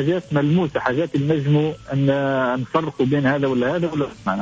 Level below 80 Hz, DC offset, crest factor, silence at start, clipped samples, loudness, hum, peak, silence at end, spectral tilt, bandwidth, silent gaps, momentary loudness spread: -52 dBFS; under 0.1%; 12 dB; 0 s; under 0.1%; -20 LUFS; none; -8 dBFS; 0 s; -8 dB/octave; 7.8 kHz; none; 5 LU